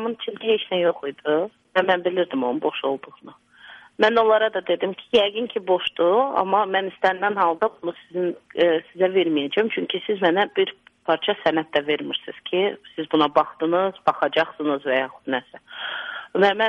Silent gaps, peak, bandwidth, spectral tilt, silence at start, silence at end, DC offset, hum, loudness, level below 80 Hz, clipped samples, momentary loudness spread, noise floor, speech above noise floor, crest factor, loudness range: none; -4 dBFS; 7.4 kHz; -6 dB/octave; 0 s; 0 s; under 0.1%; none; -22 LUFS; -66 dBFS; under 0.1%; 9 LU; -47 dBFS; 25 dB; 18 dB; 2 LU